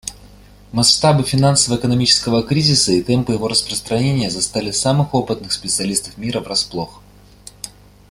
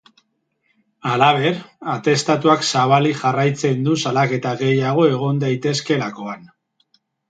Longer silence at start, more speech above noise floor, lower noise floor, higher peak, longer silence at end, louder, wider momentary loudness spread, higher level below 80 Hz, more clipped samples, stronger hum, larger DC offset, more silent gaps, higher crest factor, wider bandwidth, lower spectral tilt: second, 0.05 s vs 1.05 s; second, 26 dB vs 51 dB; second, -43 dBFS vs -69 dBFS; about the same, 0 dBFS vs 0 dBFS; second, 0.4 s vs 0.85 s; about the same, -16 LUFS vs -18 LUFS; about the same, 12 LU vs 11 LU; first, -44 dBFS vs -64 dBFS; neither; first, 50 Hz at -40 dBFS vs none; neither; neither; about the same, 18 dB vs 18 dB; first, 15 kHz vs 9.2 kHz; second, -4 dB/octave vs -5.5 dB/octave